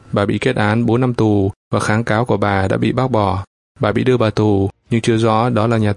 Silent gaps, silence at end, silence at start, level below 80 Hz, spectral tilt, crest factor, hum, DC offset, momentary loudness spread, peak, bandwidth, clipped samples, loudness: 1.56-1.71 s, 3.47-3.75 s; 0 s; 0.1 s; -46 dBFS; -7 dB/octave; 16 dB; none; under 0.1%; 4 LU; 0 dBFS; 11 kHz; under 0.1%; -16 LUFS